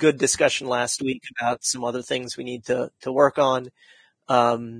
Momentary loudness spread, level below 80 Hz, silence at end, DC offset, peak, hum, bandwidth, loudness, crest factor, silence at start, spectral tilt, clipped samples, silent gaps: 9 LU; -64 dBFS; 0 s; under 0.1%; -2 dBFS; none; 10.5 kHz; -23 LUFS; 22 dB; 0 s; -3 dB/octave; under 0.1%; none